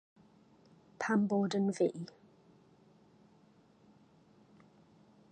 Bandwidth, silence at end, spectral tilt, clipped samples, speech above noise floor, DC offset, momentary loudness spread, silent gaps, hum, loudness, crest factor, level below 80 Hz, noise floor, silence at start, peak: 9.2 kHz; 3.25 s; -6.5 dB/octave; under 0.1%; 33 dB; under 0.1%; 15 LU; none; none; -33 LUFS; 20 dB; -84 dBFS; -65 dBFS; 1 s; -20 dBFS